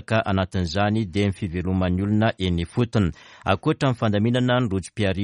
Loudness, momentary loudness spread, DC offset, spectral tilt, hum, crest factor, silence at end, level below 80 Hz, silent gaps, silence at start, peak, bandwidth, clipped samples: -23 LUFS; 4 LU; under 0.1%; -7 dB/octave; none; 18 dB; 0 s; -44 dBFS; none; 0.1 s; -4 dBFS; 11 kHz; under 0.1%